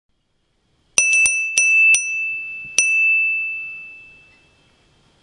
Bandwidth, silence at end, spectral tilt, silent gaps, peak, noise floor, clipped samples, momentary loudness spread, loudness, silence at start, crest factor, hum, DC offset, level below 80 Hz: 12 kHz; 1.2 s; 3 dB/octave; none; 0 dBFS; -66 dBFS; under 0.1%; 16 LU; -15 LUFS; 0.95 s; 20 dB; none; under 0.1%; -62 dBFS